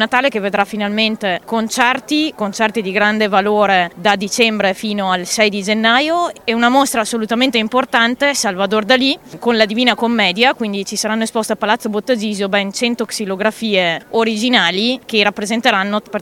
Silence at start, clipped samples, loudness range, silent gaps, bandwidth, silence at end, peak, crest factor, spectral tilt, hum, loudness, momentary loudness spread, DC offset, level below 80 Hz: 0 s; under 0.1%; 2 LU; none; 16.5 kHz; 0 s; 0 dBFS; 16 dB; -3 dB/octave; none; -15 LUFS; 6 LU; under 0.1%; -56 dBFS